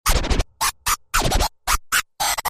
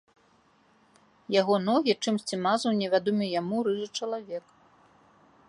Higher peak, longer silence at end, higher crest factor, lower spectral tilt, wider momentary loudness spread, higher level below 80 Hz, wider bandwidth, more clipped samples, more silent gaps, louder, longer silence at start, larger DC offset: first, -4 dBFS vs -10 dBFS; second, 0 s vs 1.1 s; about the same, 18 dB vs 18 dB; second, -2 dB/octave vs -5 dB/octave; second, 4 LU vs 9 LU; first, -26 dBFS vs -74 dBFS; first, 15.5 kHz vs 11.5 kHz; neither; neither; first, -21 LUFS vs -27 LUFS; second, 0.05 s vs 1.3 s; neither